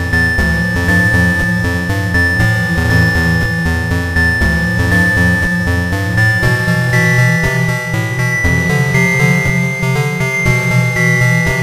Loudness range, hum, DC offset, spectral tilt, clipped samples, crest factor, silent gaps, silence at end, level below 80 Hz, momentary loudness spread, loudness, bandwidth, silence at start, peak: 1 LU; none; 0.1%; -5.5 dB/octave; under 0.1%; 12 dB; none; 0 s; -26 dBFS; 5 LU; -12 LUFS; 15.5 kHz; 0 s; 0 dBFS